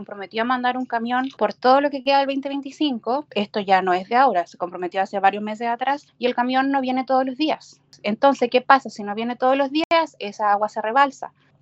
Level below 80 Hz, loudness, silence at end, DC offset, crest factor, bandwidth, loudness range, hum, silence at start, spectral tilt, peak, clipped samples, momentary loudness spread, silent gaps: -74 dBFS; -21 LUFS; 0.35 s; under 0.1%; 20 dB; 8 kHz; 2 LU; none; 0 s; -5 dB/octave; 0 dBFS; under 0.1%; 10 LU; 9.84-9.90 s